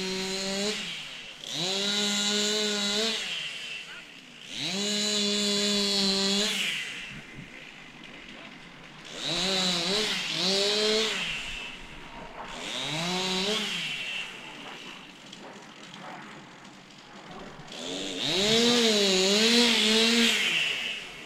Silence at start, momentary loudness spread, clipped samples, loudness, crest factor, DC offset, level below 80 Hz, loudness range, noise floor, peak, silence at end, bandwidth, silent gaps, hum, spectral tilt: 0 s; 23 LU; under 0.1%; -25 LUFS; 22 dB; under 0.1%; -58 dBFS; 12 LU; -49 dBFS; -8 dBFS; 0 s; 16 kHz; none; none; -2 dB/octave